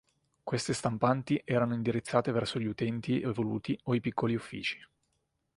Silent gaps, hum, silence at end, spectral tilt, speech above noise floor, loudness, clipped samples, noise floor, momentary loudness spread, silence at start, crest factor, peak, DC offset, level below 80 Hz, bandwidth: none; none; 0.75 s; -6 dB/octave; 48 dB; -32 LUFS; under 0.1%; -79 dBFS; 6 LU; 0.45 s; 22 dB; -10 dBFS; under 0.1%; -64 dBFS; 11.5 kHz